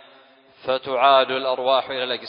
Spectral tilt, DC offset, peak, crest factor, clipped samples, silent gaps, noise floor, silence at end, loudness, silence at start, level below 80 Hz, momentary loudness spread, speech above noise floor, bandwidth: -7.5 dB/octave; under 0.1%; -4 dBFS; 18 dB; under 0.1%; none; -52 dBFS; 0 s; -20 LUFS; 0.65 s; -70 dBFS; 10 LU; 32 dB; 5.4 kHz